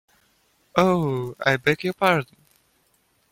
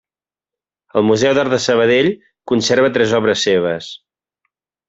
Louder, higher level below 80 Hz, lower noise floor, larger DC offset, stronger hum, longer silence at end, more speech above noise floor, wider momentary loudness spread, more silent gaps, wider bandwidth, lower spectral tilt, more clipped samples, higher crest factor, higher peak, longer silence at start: second, -22 LUFS vs -15 LUFS; about the same, -58 dBFS vs -56 dBFS; second, -65 dBFS vs under -90 dBFS; neither; neither; first, 1.05 s vs 0.9 s; second, 44 dB vs over 76 dB; second, 6 LU vs 9 LU; neither; first, 16.5 kHz vs 8 kHz; first, -6 dB/octave vs -4.5 dB/octave; neither; first, 22 dB vs 14 dB; about the same, -2 dBFS vs -2 dBFS; second, 0.75 s vs 0.95 s